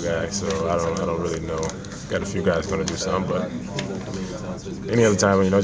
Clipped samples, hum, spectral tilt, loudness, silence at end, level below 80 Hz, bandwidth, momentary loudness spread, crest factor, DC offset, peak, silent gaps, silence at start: under 0.1%; none; -5 dB/octave; -24 LUFS; 0 s; -42 dBFS; 8 kHz; 12 LU; 18 dB; under 0.1%; -4 dBFS; none; 0 s